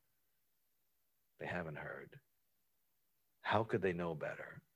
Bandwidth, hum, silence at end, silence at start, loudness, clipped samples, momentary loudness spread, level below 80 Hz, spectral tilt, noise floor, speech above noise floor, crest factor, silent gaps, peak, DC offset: 16 kHz; none; 0.15 s; 1.4 s; -41 LUFS; under 0.1%; 14 LU; -70 dBFS; -7 dB/octave; -83 dBFS; 43 dB; 26 dB; none; -18 dBFS; under 0.1%